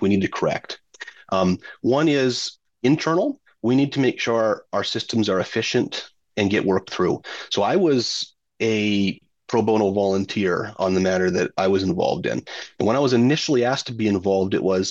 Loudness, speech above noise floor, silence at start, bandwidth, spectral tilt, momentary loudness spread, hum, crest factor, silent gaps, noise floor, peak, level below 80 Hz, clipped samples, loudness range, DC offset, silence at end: -21 LUFS; 21 dB; 0 s; 8.2 kHz; -5.5 dB/octave; 9 LU; none; 16 dB; none; -42 dBFS; -6 dBFS; -64 dBFS; under 0.1%; 1 LU; under 0.1%; 0 s